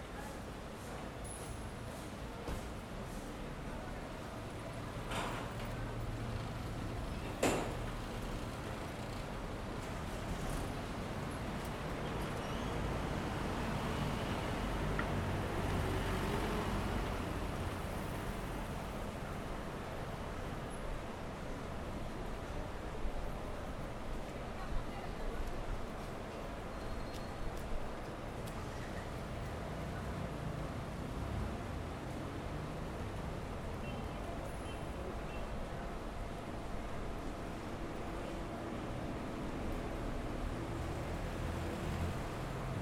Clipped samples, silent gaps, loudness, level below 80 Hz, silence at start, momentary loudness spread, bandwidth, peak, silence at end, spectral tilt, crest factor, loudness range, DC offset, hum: under 0.1%; none; -42 LUFS; -46 dBFS; 0 s; 7 LU; 18 kHz; -20 dBFS; 0 s; -5.5 dB/octave; 20 dB; 6 LU; under 0.1%; none